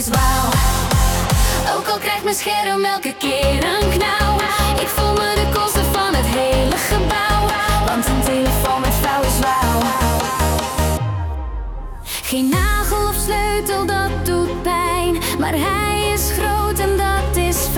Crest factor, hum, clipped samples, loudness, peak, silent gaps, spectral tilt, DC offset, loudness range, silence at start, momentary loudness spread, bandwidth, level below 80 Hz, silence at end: 12 dB; none; under 0.1%; -17 LUFS; -4 dBFS; none; -4 dB/octave; under 0.1%; 3 LU; 0 s; 3 LU; 19 kHz; -24 dBFS; 0 s